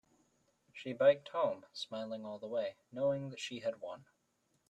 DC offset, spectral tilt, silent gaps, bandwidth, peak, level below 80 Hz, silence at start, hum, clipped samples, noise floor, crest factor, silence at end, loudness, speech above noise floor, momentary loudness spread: under 0.1%; -5 dB/octave; none; 9.4 kHz; -16 dBFS; -82 dBFS; 0.75 s; none; under 0.1%; -78 dBFS; 22 dB; 0.65 s; -37 LUFS; 42 dB; 18 LU